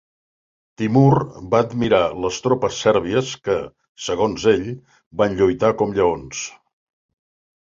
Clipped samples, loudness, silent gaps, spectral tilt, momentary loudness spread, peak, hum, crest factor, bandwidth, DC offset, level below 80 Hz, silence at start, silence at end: under 0.1%; -19 LUFS; 3.89-3.95 s, 5.06-5.11 s; -6 dB/octave; 13 LU; -2 dBFS; none; 18 dB; 7.6 kHz; under 0.1%; -48 dBFS; 0.8 s; 1.15 s